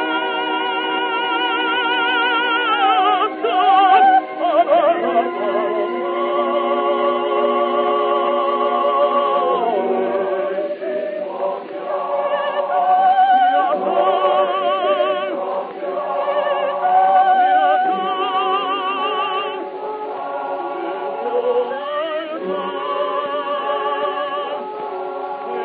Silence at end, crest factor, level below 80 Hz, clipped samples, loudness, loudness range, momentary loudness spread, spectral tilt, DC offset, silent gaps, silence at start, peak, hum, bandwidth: 0 s; 16 dB; -78 dBFS; under 0.1%; -18 LUFS; 7 LU; 11 LU; -8 dB/octave; under 0.1%; none; 0 s; -2 dBFS; none; 4.6 kHz